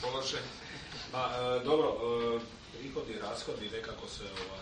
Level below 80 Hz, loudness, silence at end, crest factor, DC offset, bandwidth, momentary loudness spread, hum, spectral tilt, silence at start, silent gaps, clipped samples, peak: -58 dBFS; -36 LUFS; 0 s; 18 dB; under 0.1%; 9.4 kHz; 13 LU; none; -4 dB/octave; 0 s; none; under 0.1%; -18 dBFS